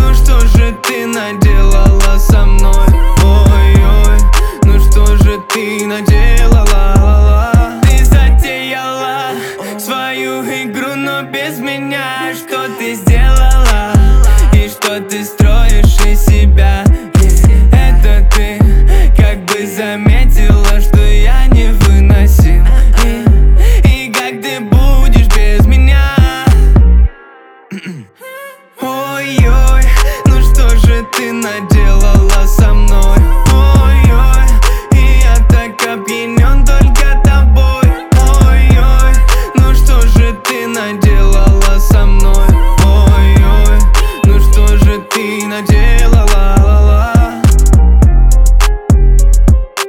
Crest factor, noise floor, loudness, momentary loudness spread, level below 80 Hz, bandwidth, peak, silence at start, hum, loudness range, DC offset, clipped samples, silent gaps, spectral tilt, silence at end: 6 dB; -37 dBFS; -10 LUFS; 9 LU; -6 dBFS; 16.5 kHz; 0 dBFS; 0 s; none; 4 LU; under 0.1%; 0.3%; none; -5.5 dB/octave; 0 s